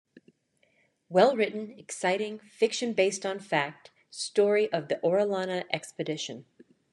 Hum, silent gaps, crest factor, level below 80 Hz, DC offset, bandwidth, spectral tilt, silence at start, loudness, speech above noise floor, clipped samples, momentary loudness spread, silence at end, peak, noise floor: none; none; 22 dB; -82 dBFS; under 0.1%; 11.5 kHz; -4 dB/octave; 1.1 s; -28 LUFS; 42 dB; under 0.1%; 13 LU; 0.5 s; -8 dBFS; -70 dBFS